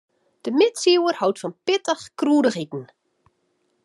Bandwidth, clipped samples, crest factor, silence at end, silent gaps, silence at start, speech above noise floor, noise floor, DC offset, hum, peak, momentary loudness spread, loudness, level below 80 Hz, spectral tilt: 12 kHz; under 0.1%; 18 dB; 1 s; none; 0.45 s; 49 dB; -69 dBFS; under 0.1%; none; -4 dBFS; 13 LU; -21 LUFS; -78 dBFS; -4 dB/octave